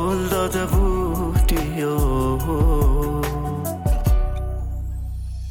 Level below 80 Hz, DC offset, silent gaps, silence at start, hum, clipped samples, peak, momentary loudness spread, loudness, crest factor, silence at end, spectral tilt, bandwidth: -22 dBFS; under 0.1%; none; 0 s; none; under 0.1%; -8 dBFS; 9 LU; -22 LUFS; 12 dB; 0 s; -6.5 dB/octave; 17.5 kHz